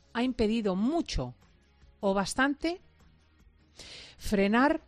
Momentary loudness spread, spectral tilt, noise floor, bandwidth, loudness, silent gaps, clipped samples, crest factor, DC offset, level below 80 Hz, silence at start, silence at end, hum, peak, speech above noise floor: 19 LU; -5 dB/octave; -61 dBFS; 13.5 kHz; -29 LUFS; none; under 0.1%; 18 dB; under 0.1%; -46 dBFS; 0.15 s; 0.1 s; none; -12 dBFS; 33 dB